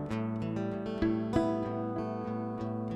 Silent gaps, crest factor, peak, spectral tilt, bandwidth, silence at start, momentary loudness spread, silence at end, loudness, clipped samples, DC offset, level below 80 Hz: none; 18 dB; -14 dBFS; -8.5 dB/octave; 10 kHz; 0 s; 6 LU; 0 s; -34 LUFS; under 0.1%; under 0.1%; -52 dBFS